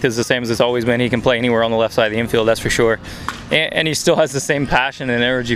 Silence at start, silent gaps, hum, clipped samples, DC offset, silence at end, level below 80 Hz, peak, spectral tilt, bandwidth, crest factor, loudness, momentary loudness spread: 0 s; none; none; under 0.1%; under 0.1%; 0 s; -40 dBFS; 0 dBFS; -4 dB/octave; 15.5 kHz; 16 dB; -16 LUFS; 3 LU